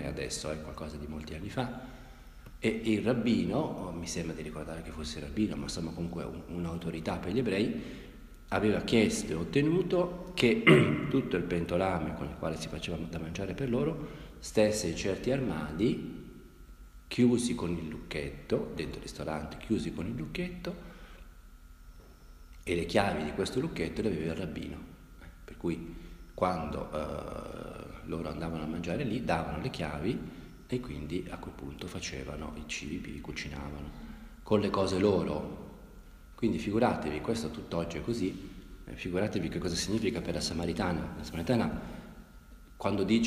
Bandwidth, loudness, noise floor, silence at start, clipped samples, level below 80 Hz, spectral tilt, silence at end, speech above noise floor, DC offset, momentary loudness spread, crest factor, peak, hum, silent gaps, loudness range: 15.5 kHz; -33 LUFS; -52 dBFS; 0 s; under 0.1%; -50 dBFS; -5.5 dB/octave; 0 s; 20 dB; under 0.1%; 17 LU; 26 dB; -8 dBFS; none; none; 9 LU